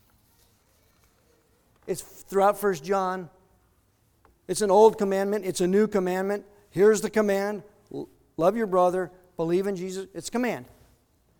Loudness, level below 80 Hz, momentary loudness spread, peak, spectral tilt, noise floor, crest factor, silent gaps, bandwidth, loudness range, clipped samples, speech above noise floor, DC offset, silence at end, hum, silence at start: -25 LUFS; -62 dBFS; 16 LU; -4 dBFS; -5.5 dB/octave; -66 dBFS; 22 dB; none; 20 kHz; 6 LU; under 0.1%; 41 dB; under 0.1%; 0.75 s; none; 1.85 s